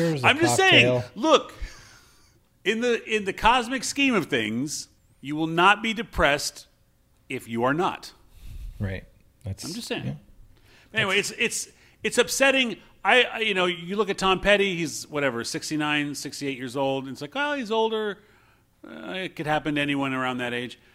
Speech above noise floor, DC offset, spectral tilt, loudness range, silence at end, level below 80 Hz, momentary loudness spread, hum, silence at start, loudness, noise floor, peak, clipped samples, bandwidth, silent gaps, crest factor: 38 dB; under 0.1%; -3.5 dB/octave; 8 LU; 0.2 s; -48 dBFS; 16 LU; none; 0 s; -24 LUFS; -62 dBFS; -2 dBFS; under 0.1%; 16 kHz; none; 22 dB